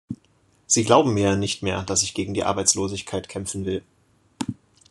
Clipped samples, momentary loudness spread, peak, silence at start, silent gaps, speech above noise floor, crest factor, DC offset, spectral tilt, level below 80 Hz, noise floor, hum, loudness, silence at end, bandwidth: under 0.1%; 15 LU; -2 dBFS; 0.1 s; none; 39 dB; 22 dB; under 0.1%; -3.5 dB/octave; -58 dBFS; -61 dBFS; none; -22 LUFS; 0.35 s; 12.5 kHz